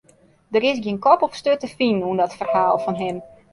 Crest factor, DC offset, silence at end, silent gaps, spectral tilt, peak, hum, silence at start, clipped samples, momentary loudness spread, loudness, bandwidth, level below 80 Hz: 18 dB; under 0.1%; 0.25 s; none; -6 dB/octave; -2 dBFS; none; 0.5 s; under 0.1%; 8 LU; -20 LUFS; 11.5 kHz; -60 dBFS